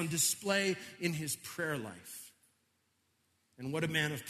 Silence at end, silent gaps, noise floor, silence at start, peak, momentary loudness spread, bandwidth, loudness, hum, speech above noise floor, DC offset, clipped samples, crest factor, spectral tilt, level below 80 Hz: 0 s; none; -77 dBFS; 0 s; -18 dBFS; 17 LU; 13.5 kHz; -34 LUFS; none; 41 dB; under 0.1%; under 0.1%; 20 dB; -3 dB/octave; -74 dBFS